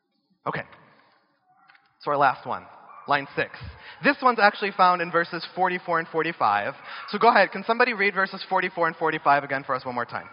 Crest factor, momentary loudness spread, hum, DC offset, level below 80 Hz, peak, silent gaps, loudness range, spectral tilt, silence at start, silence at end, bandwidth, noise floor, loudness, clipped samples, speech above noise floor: 22 dB; 15 LU; none; under 0.1%; -62 dBFS; -4 dBFS; none; 6 LU; -2 dB/octave; 0.45 s; 0.05 s; 5.6 kHz; -63 dBFS; -23 LUFS; under 0.1%; 40 dB